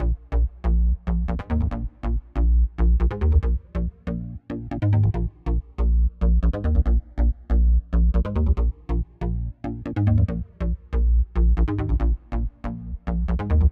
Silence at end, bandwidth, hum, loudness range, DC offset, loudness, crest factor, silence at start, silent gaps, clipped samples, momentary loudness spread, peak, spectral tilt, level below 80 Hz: 0 s; 3.4 kHz; none; 2 LU; under 0.1%; -24 LUFS; 14 dB; 0 s; none; under 0.1%; 9 LU; -6 dBFS; -10.5 dB/octave; -22 dBFS